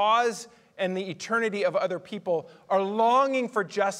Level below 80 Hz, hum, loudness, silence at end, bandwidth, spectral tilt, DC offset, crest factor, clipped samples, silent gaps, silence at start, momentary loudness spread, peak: -82 dBFS; none; -26 LUFS; 0 s; 15 kHz; -4 dB/octave; under 0.1%; 16 dB; under 0.1%; none; 0 s; 10 LU; -12 dBFS